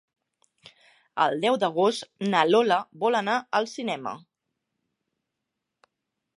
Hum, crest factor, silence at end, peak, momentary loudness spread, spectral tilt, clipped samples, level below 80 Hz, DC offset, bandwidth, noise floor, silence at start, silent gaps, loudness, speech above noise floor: none; 22 dB; 2.2 s; -4 dBFS; 12 LU; -4.5 dB/octave; under 0.1%; -80 dBFS; under 0.1%; 11.5 kHz; -84 dBFS; 1.15 s; none; -25 LUFS; 59 dB